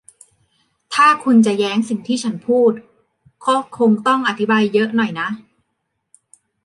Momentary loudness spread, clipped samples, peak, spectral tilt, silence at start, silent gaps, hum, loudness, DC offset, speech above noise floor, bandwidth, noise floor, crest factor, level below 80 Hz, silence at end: 11 LU; under 0.1%; -2 dBFS; -5 dB/octave; 0.9 s; none; none; -16 LUFS; under 0.1%; 57 dB; 11.5 kHz; -73 dBFS; 16 dB; -68 dBFS; 1.25 s